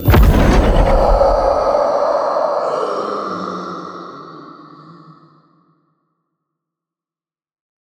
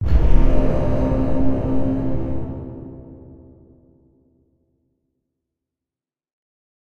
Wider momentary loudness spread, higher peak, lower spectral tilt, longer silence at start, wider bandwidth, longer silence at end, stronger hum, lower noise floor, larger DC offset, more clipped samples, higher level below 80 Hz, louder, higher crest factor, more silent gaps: about the same, 19 LU vs 19 LU; about the same, 0 dBFS vs 0 dBFS; second, -7 dB/octave vs -10 dB/octave; about the same, 0 s vs 0 s; first, 20 kHz vs 4.7 kHz; second, 3.15 s vs 3.8 s; neither; about the same, under -90 dBFS vs under -90 dBFS; neither; neither; about the same, -20 dBFS vs -24 dBFS; first, -15 LUFS vs -22 LUFS; about the same, 16 dB vs 18 dB; neither